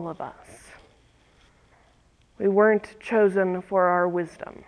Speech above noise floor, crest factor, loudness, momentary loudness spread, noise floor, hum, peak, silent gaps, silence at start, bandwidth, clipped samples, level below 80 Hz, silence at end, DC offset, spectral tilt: 37 dB; 18 dB; -23 LUFS; 15 LU; -60 dBFS; none; -8 dBFS; none; 0 s; 11 kHz; under 0.1%; -62 dBFS; 0.25 s; under 0.1%; -7.5 dB/octave